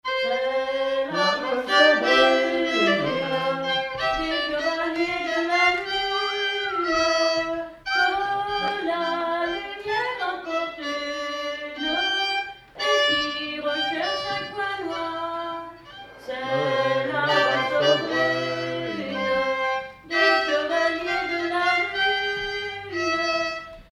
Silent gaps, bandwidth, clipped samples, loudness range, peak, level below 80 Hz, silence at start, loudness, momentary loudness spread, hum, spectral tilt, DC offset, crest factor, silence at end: none; 14 kHz; under 0.1%; 6 LU; -6 dBFS; -54 dBFS; 0.05 s; -23 LUFS; 9 LU; none; -3.5 dB/octave; under 0.1%; 18 dB; 0.1 s